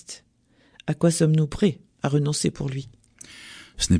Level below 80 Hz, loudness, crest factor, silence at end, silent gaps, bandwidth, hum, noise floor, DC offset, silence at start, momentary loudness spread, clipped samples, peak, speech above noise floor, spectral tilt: -46 dBFS; -24 LUFS; 16 dB; 0 s; none; 10.5 kHz; none; -61 dBFS; under 0.1%; 0.1 s; 21 LU; under 0.1%; -8 dBFS; 39 dB; -5.5 dB/octave